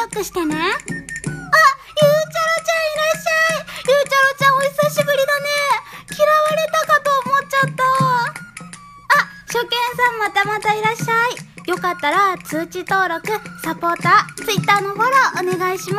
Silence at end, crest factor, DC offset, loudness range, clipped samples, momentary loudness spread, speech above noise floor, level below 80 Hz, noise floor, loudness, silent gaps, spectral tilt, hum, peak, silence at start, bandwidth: 0 s; 16 dB; under 0.1%; 3 LU; under 0.1%; 10 LU; 19 dB; -54 dBFS; -38 dBFS; -17 LUFS; none; -3.5 dB/octave; none; -2 dBFS; 0 s; 15.5 kHz